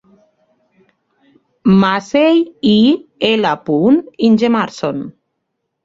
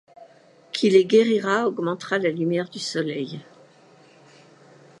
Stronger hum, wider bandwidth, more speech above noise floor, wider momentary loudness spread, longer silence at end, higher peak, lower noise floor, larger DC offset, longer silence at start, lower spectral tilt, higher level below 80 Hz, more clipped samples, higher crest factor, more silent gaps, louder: neither; second, 7.6 kHz vs 11.5 kHz; first, 60 dB vs 32 dB; second, 9 LU vs 14 LU; second, 0.75 s vs 1.6 s; first, 0 dBFS vs -4 dBFS; first, -73 dBFS vs -53 dBFS; neither; first, 1.65 s vs 0.2 s; about the same, -6.5 dB/octave vs -5.5 dB/octave; first, -54 dBFS vs -78 dBFS; neither; second, 14 dB vs 20 dB; neither; first, -14 LUFS vs -22 LUFS